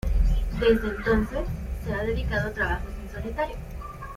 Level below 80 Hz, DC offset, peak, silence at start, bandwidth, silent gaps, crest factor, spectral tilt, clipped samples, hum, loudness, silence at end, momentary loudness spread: -30 dBFS; under 0.1%; -8 dBFS; 0.05 s; 15 kHz; none; 18 dB; -7 dB/octave; under 0.1%; none; -27 LUFS; 0 s; 13 LU